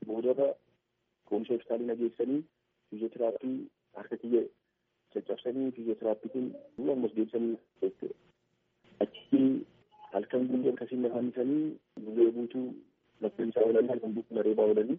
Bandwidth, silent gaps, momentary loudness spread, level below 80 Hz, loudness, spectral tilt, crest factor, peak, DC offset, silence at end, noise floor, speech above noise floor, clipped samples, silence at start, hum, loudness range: 3.7 kHz; none; 14 LU; -82 dBFS; -32 LUFS; -7 dB/octave; 20 dB; -12 dBFS; under 0.1%; 0 s; -80 dBFS; 49 dB; under 0.1%; 0 s; none; 4 LU